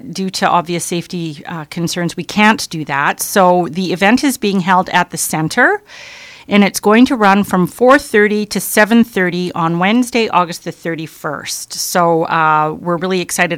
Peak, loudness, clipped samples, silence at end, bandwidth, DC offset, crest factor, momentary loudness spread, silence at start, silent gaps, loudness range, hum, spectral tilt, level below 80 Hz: 0 dBFS; -14 LUFS; 0.1%; 0 s; 17 kHz; under 0.1%; 14 dB; 12 LU; 0.05 s; none; 4 LU; none; -4.5 dB/octave; -52 dBFS